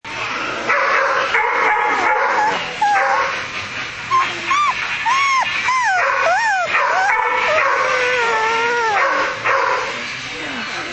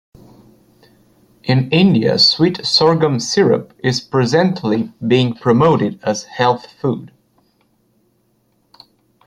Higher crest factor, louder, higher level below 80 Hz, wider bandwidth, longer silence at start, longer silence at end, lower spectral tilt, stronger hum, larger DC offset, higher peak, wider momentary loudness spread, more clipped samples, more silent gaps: about the same, 16 dB vs 16 dB; about the same, -16 LUFS vs -15 LUFS; about the same, -54 dBFS vs -54 dBFS; second, 8.8 kHz vs 11.5 kHz; second, 0.05 s vs 1.45 s; second, 0 s vs 2.2 s; second, -1.5 dB/octave vs -5.5 dB/octave; neither; neither; about the same, -2 dBFS vs 0 dBFS; second, 8 LU vs 11 LU; neither; neither